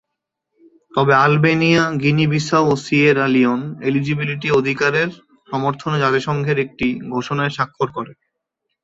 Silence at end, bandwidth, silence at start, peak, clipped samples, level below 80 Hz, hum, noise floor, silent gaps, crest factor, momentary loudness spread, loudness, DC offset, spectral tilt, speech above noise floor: 0.7 s; 8 kHz; 0.95 s; -2 dBFS; under 0.1%; -54 dBFS; none; -79 dBFS; none; 16 dB; 10 LU; -17 LUFS; under 0.1%; -6.5 dB/octave; 62 dB